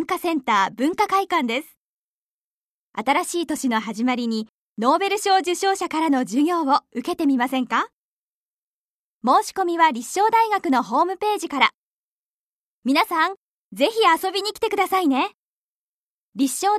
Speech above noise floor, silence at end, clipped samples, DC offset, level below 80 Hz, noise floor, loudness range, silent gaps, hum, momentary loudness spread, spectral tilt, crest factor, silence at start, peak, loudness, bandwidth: over 69 dB; 0 s; under 0.1%; under 0.1%; -68 dBFS; under -90 dBFS; 3 LU; 1.77-2.92 s, 4.49-4.76 s, 7.93-9.21 s, 11.74-12.83 s, 13.37-13.71 s, 15.34-16.32 s; none; 8 LU; -3 dB/octave; 22 dB; 0 s; -2 dBFS; -21 LUFS; 14 kHz